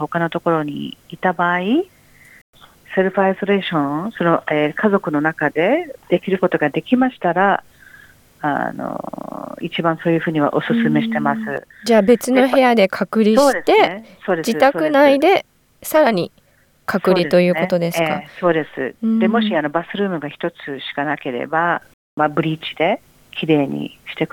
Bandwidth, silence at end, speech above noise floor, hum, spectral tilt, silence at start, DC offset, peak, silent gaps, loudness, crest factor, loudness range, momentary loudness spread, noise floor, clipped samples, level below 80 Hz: 18.5 kHz; 0.05 s; 29 dB; none; -6 dB/octave; 0 s; under 0.1%; -2 dBFS; 2.41-2.53 s, 21.94-22.17 s; -18 LUFS; 16 dB; 6 LU; 12 LU; -46 dBFS; under 0.1%; -60 dBFS